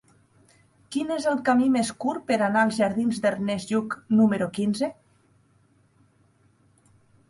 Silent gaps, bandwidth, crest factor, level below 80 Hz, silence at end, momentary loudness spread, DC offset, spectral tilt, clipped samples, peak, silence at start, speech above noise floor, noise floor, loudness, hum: none; 11.5 kHz; 18 dB; -66 dBFS; 2.35 s; 8 LU; under 0.1%; -5.5 dB/octave; under 0.1%; -8 dBFS; 0.9 s; 39 dB; -62 dBFS; -24 LUFS; none